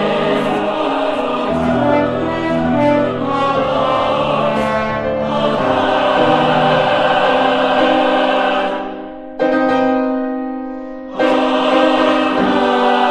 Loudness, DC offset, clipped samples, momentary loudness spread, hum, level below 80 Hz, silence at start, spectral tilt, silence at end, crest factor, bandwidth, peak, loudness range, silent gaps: -15 LUFS; under 0.1%; under 0.1%; 7 LU; none; -44 dBFS; 0 s; -6 dB/octave; 0 s; 14 dB; 10.5 kHz; -2 dBFS; 3 LU; none